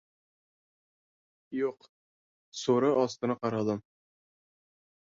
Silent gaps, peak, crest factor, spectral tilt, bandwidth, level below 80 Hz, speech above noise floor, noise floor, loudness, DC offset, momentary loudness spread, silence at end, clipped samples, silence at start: 1.89-2.52 s; -14 dBFS; 20 dB; -6 dB/octave; 7.8 kHz; -74 dBFS; over 61 dB; under -90 dBFS; -30 LUFS; under 0.1%; 12 LU; 1.3 s; under 0.1%; 1.5 s